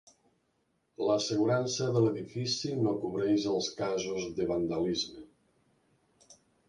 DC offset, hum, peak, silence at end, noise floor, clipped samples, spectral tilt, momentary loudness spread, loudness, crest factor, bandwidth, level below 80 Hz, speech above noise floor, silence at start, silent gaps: under 0.1%; none; -14 dBFS; 0.35 s; -76 dBFS; under 0.1%; -5 dB/octave; 6 LU; -31 LUFS; 18 dB; 10.5 kHz; -64 dBFS; 45 dB; 1 s; none